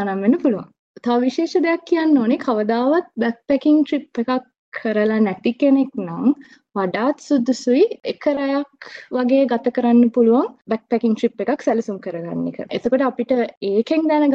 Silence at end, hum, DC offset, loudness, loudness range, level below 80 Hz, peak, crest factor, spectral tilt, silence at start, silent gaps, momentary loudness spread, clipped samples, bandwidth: 0 s; none; under 0.1%; -19 LUFS; 2 LU; -66 dBFS; -4 dBFS; 14 dB; -6.5 dB/octave; 0 s; 0.79-0.95 s, 4.59-4.72 s, 13.57-13.61 s; 10 LU; under 0.1%; 7.8 kHz